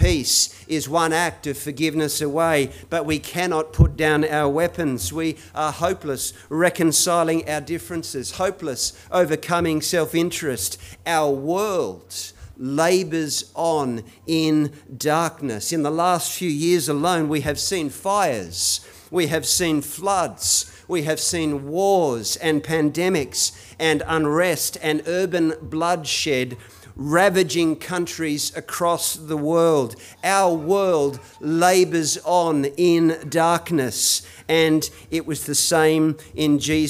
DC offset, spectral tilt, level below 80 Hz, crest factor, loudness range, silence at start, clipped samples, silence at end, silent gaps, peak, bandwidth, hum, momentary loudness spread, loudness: under 0.1%; -4 dB/octave; -40 dBFS; 18 dB; 3 LU; 0 s; under 0.1%; 0 s; none; -2 dBFS; 16 kHz; none; 9 LU; -21 LUFS